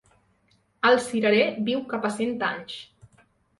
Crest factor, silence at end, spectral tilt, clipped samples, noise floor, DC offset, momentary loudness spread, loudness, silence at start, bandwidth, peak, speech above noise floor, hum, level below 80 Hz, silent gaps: 18 dB; 0.75 s; -4.5 dB/octave; under 0.1%; -66 dBFS; under 0.1%; 13 LU; -24 LUFS; 0.85 s; 11.5 kHz; -8 dBFS; 42 dB; none; -68 dBFS; none